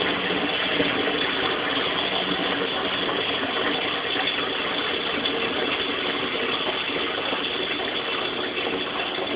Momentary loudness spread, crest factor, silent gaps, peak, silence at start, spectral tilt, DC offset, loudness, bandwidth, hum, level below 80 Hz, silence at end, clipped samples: 3 LU; 18 dB; none; -8 dBFS; 0 s; -8 dB/octave; under 0.1%; -24 LUFS; 5.4 kHz; none; -56 dBFS; 0 s; under 0.1%